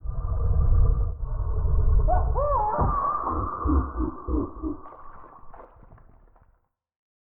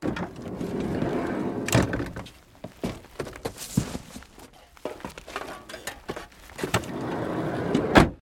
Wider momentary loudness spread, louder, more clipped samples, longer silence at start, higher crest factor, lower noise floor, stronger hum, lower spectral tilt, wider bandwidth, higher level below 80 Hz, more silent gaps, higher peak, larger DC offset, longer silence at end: second, 11 LU vs 18 LU; first, -26 LUFS vs -29 LUFS; neither; about the same, 0.05 s vs 0 s; second, 14 dB vs 28 dB; first, -66 dBFS vs -50 dBFS; neither; first, -15 dB/octave vs -5.5 dB/octave; second, 1.9 kHz vs 17.5 kHz; first, -26 dBFS vs -44 dBFS; neither; second, -10 dBFS vs 0 dBFS; neither; first, 1.55 s vs 0.05 s